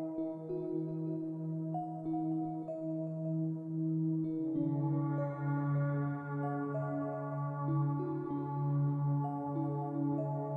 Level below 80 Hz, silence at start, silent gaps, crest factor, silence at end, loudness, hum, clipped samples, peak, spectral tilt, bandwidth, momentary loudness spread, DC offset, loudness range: -76 dBFS; 0 s; none; 12 dB; 0 s; -36 LUFS; none; under 0.1%; -24 dBFS; -12.5 dB/octave; 2.4 kHz; 5 LU; under 0.1%; 3 LU